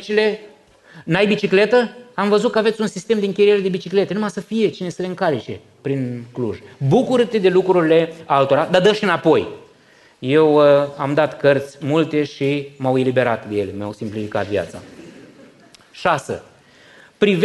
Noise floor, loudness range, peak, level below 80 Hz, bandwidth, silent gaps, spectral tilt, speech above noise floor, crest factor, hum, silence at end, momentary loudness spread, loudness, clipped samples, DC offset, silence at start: -51 dBFS; 7 LU; -2 dBFS; -60 dBFS; 12 kHz; none; -6.5 dB/octave; 33 dB; 16 dB; none; 0 s; 12 LU; -18 LUFS; under 0.1%; under 0.1%; 0 s